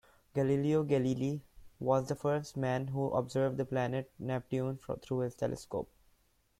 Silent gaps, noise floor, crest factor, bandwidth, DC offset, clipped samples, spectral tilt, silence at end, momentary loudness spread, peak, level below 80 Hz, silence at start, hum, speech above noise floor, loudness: none; -71 dBFS; 18 dB; 14 kHz; under 0.1%; under 0.1%; -7.5 dB/octave; 0.75 s; 9 LU; -16 dBFS; -64 dBFS; 0.35 s; none; 38 dB; -34 LUFS